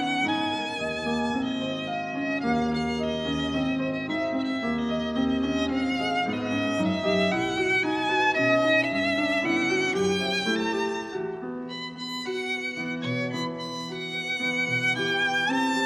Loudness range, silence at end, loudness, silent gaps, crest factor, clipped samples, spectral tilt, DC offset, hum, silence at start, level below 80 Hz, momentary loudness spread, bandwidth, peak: 6 LU; 0 s; -26 LUFS; none; 16 dB; under 0.1%; -4.5 dB/octave; under 0.1%; none; 0 s; -54 dBFS; 8 LU; 13.5 kHz; -10 dBFS